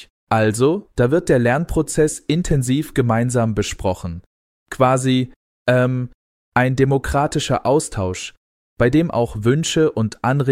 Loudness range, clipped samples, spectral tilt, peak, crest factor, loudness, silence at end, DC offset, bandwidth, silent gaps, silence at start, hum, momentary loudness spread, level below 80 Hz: 2 LU; under 0.1%; -6 dB/octave; -2 dBFS; 16 dB; -18 LUFS; 0 s; under 0.1%; 15.5 kHz; 0.10-0.27 s, 4.26-4.66 s, 5.36-5.66 s, 6.14-6.52 s, 8.37-8.76 s; 0 s; none; 9 LU; -38 dBFS